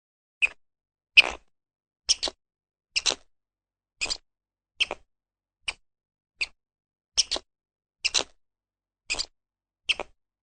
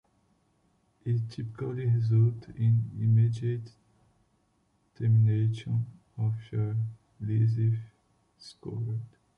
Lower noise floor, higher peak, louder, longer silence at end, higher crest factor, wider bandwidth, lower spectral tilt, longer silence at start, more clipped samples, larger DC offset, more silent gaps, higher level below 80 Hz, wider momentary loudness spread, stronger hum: first, under -90 dBFS vs -71 dBFS; first, -2 dBFS vs -16 dBFS; first, -26 LUFS vs -29 LUFS; first, 0.45 s vs 0.3 s; first, 30 dB vs 14 dB; first, 9.6 kHz vs 5.2 kHz; second, 1.5 dB/octave vs -9.5 dB/octave; second, 0.4 s vs 1.05 s; neither; neither; neither; about the same, -58 dBFS vs -60 dBFS; first, 17 LU vs 13 LU; neither